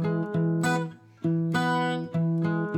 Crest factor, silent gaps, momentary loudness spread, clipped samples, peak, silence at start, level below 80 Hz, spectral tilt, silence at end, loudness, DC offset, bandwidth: 12 dB; none; 5 LU; under 0.1%; -14 dBFS; 0 s; -72 dBFS; -6.5 dB/octave; 0 s; -27 LUFS; under 0.1%; 12 kHz